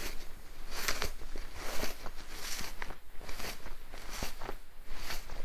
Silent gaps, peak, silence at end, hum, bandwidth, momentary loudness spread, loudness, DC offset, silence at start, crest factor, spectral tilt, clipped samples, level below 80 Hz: none; -12 dBFS; 0 s; none; 16 kHz; 13 LU; -42 LUFS; under 0.1%; 0 s; 20 dB; -2 dB/octave; under 0.1%; -44 dBFS